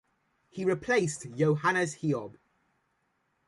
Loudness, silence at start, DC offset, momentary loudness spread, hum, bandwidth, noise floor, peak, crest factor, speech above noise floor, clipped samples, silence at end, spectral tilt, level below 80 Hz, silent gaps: -29 LUFS; 0.55 s; under 0.1%; 8 LU; none; 11.5 kHz; -75 dBFS; -14 dBFS; 18 dB; 47 dB; under 0.1%; 1.15 s; -5.5 dB/octave; -68 dBFS; none